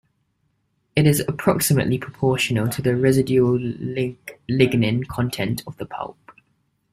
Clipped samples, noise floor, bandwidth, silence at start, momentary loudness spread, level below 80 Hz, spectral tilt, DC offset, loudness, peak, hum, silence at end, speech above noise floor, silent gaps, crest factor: under 0.1%; -69 dBFS; 16 kHz; 0.95 s; 13 LU; -52 dBFS; -5.5 dB/octave; under 0.1%; -21 LUFS; -2 dBFS; none; 0.6 s; 49 dB; none; 20 dB